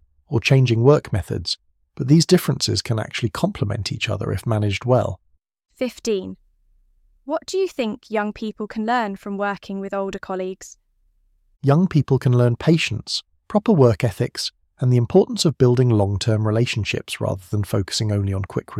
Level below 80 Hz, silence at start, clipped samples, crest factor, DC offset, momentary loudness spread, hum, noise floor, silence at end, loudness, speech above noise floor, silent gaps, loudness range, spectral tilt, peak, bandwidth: -48 dBFS; 0.3 s; under 0.1%; 18 dB; under 0.1%; 12 LU; none; -62 dBFS; 0 s; -21 LUFS; 42 dB; none; 7 LU; -6 dB/octave; -2 dBFS; 15.5 kHz